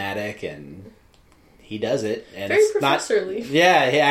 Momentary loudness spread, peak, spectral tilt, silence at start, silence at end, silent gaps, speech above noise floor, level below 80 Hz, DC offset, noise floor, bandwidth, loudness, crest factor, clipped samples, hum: 18 LU; -2 dBFS; -4 dB/octave; 0 s; 0 s; none; 34 dB; -60 dBFS; under 0.1%; -54 dBFS; 15 kHz; -20 LUFS; 18 dB; under 0.1%; none